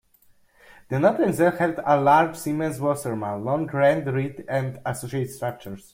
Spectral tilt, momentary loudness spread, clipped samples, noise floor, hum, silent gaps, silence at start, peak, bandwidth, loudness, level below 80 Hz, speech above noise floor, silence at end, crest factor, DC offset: -6.5 dB/octave; 11 LU; under 0.1%; -59 dBFS; none; none; 0.9 s; -4 dBFS; 16 kHz; -23 LUFS; -60 dBFS; 36 dB; 0.15 s; 18 dB; under 0.1%